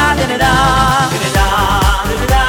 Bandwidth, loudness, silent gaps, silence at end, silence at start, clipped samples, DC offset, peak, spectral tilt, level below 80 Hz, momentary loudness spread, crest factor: 18 kHz; -12 LUFS; none; 0 s; 0 s; under 0.1%; under 0.1%; 0 dBFS; -4 dB/octave; -18 dBFS; 4 LU; 12 dB